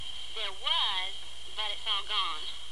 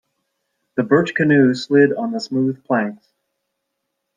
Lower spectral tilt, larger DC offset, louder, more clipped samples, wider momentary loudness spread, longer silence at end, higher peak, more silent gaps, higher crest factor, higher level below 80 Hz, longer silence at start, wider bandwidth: second, 0 dB/octave vs -7 dB/octave; first, 2% vs under 0.1%; second, -31 LUFS vs -18 LUFS; neither; about the same, 11 LU vs 10 LU; second, 0 s vs 1.2 s; second, -16 dBFS vs -2 dBFS; neither; about the same, 18 dB vs 18 dB; first, -58 dBFS vs -64 dBFS; second, 0 s vs 0.75 s; first, 12.5 kHz vs 9.2 kHz